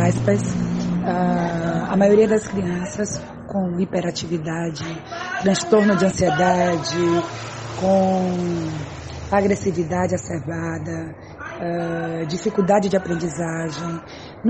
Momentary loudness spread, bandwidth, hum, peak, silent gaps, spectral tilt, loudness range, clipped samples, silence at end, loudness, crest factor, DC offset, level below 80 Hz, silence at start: 13 LU; 8.8 kHz; none; -4 dBFS; none; -6 dB/octave; 5 LU; under 0.1%; 0 s; -21 LUFS; 18 dB; under 0.1%; -46 dBFS; 0 s